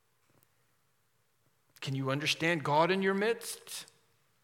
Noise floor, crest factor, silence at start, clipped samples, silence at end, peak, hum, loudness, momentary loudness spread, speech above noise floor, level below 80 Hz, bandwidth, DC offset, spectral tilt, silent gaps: -76 dBFS; 20 dB; 1.8 s; under 0.1%; 0.6 s; -14 dBFS; none; -31 LUFS; 15 LU; 45 dB; -84 dBFS; 17.5 kHz; under 0.1%; -4.5 dB/octave; none